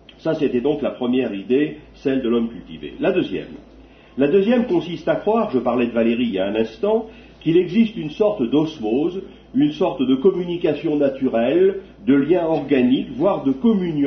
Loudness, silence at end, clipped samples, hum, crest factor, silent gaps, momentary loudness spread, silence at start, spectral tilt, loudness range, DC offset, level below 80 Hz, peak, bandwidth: -20 LUFS; 0 s; under 0.1%; none; 14 dB; none; 8 LU; 0.25 s; -8 dB/octave; 3 LU; under 0.1%; -50 dBFS; -4 dBFS; 6.4 kHz